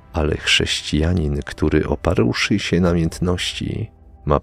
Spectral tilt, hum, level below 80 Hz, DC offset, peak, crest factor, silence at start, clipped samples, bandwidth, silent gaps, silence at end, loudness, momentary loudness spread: -5 dB/octave; none; -30 dBFS; under 0.1%; 0 dBFS; 20 dB; 0.1 s; under 0.1%; 14.5 kHz; none; 0 s; -19 LUFS; 9 LU